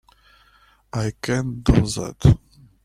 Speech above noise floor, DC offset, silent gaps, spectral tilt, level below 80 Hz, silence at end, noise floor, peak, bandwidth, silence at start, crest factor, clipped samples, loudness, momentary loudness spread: 37 dB; under 0.1%; none; -6.5 dB/octave; -32 dBFS; 0.5 s; -56 dBFS; -2 dBFS; 13 kHz; 0.95 s; 20 dB; under 0.1%; -21 LUFS; 9 LU